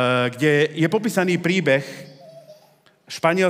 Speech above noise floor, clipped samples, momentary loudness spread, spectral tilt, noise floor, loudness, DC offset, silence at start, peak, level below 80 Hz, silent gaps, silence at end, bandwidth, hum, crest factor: 36 dB; under 0.1%; 15 LU; -5.5 dB/octave; -56 dBFS; -20 LUFS; under 0.1%; 0 s; -4 dBFS; -74 dBFS; none; 0 s; 16 kHz; none; 18 dB